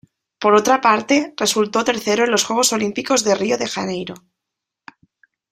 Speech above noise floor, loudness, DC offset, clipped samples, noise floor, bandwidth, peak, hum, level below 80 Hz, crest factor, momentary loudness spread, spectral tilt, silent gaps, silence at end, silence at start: 65 dB; -17 LUFS; under 0.1%; under 0.1%; -82 dBFS; 15.5 kHz; 0 dBFS; none; -60 dBFS; 18 dB; 8 LU; -2.5 dB/octave; none; 1.35 s; 0.4 s